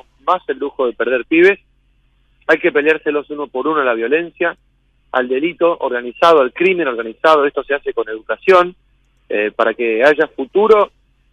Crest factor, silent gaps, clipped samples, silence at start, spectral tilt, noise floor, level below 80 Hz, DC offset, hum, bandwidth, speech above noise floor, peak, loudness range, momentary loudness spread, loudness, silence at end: 16 dB; none; under 0.1%; 0.25 s; -5.5 dB/octave; -56 dBFS; -56 dBFS; under 0.1%; none; 9.8 kHz; 42 dB; 0 dBFS; 3 LU; 10 LU; -15 LUFS; 0.45 s